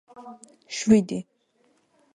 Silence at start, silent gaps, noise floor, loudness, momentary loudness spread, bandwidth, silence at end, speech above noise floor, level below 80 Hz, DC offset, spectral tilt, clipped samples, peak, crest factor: 0.2 s; none; -66 dBFS; -23 LUFS; 25 LU; 10 kHz; 0.95 s; 42 dB; -62 dBFS; under 0.1%; -5.5 dB/octave; under 0.1%; -6 dBFS; 22 dB